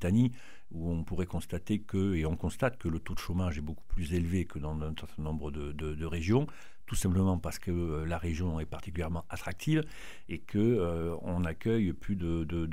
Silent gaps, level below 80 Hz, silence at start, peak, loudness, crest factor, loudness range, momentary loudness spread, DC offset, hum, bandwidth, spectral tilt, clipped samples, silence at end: none; -44 dBFS; 0 s; -14 dBFS; -34 LUFS; 18 dB; 2 LU; 11 LU; 0.9%; none; 16 kHz; -7 dB/octave; under 0.1%; 0 s